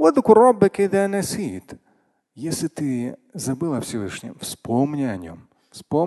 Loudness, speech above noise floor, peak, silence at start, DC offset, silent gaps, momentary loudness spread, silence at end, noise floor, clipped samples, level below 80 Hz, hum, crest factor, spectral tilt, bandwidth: -21 LUFS; 44 dB; 0 dBFS; 0 s; under 0.1%; none; 18 LU; 0 s; -64 dBFS; under 0.1%; -54 dBFS; none; 20 dB; -6 dB/octave; 12.5 kHz